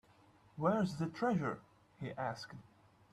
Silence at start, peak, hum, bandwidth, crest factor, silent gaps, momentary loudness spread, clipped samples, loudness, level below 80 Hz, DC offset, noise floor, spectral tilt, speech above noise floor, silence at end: 0.55 s; -22 dBFS; none; 12.5 kHz; 18 dB; none; 17 LU; under 0.1%; -38 LUFS; -72 dBFS; under 0.1%; -66 dBFS; -7 dB/octave; 29 dB; 0.5 s